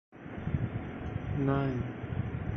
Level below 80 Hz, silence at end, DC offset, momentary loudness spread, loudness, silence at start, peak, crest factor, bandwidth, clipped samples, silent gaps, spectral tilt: -46 dBFS; 0 s; under 0.1%; 9 LU; -34 LUFS; 0.1 s; -16 dBFS; 18 dB; 6.2 kHz; under 0.1%; none; -10 dB/octave